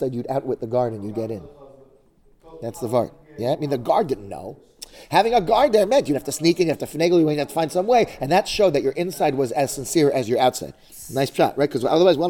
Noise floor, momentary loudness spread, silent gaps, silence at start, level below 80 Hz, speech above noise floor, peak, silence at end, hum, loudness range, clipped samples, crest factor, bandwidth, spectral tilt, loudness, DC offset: -55 dBFS; 15 LU; none; 0 s; -50 dBFS; 35 dB; -4 dBFS; 0 s; none; 8 LU; under 0.1%; 16 dB; 19 kHz; -5 dB/octave; -21 LUFS; under 0.1%